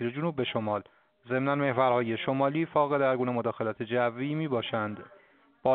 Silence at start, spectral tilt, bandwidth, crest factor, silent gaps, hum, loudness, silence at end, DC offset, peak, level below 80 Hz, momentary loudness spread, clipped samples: 0 s; -5 dB/octave; 4.5 kHz; 18 dB; none; none; -29 LUFS; 0 s; under 0.1%; -12 dBFS; -70 dBFS; 8 LU; under 0.1%